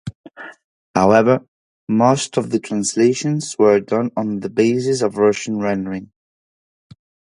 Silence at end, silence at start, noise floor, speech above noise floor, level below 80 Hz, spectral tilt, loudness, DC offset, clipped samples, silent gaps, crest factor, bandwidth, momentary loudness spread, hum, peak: 1.3 s; 0.05 s; under -90 dBFS; over 73 dB; -56 dBFS; -5.5 dB/octave; -18 LUFS; under 0.1%; under 0.1%; 0.15-0.24 s, 0.64-0.94 s, 1.48-1.87 s; 18 dB; 11.5 kHz; 15 LU; none; 0 dBFS